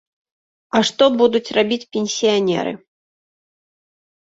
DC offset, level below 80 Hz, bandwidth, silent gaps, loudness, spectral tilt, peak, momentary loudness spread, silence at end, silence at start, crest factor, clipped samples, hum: under 0.1%; -62 dBFS; 8 kHz; none; -18 LUFS; -4 dB/octave; -2 dBFS; 8 LU; 1.45 s; 0.75 s; 18 dB; under 0.1%; none